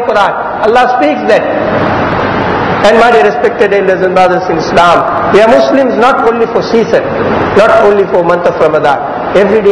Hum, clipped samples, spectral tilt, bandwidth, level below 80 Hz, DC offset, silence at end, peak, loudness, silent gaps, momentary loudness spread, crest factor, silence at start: none; 5%; -6 dB/octave; 11 kHz; -36 dBFS; 0.3%; 0 s; 0 dBFS; -8 LUFS; none; 6 LU; 8 dB; 0 s